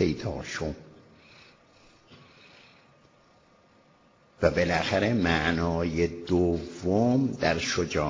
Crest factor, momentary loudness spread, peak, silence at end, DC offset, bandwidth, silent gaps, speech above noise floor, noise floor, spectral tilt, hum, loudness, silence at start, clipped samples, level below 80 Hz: 20 dB; 9 LU; -8 dBFS; 0 s; under 0.1%; 7.6 kHz; none; 34 dB; -60 dBFS; -5.5 dB/octave; none; -27 LUFS; 0 s; under 0.1%; -44 dBFS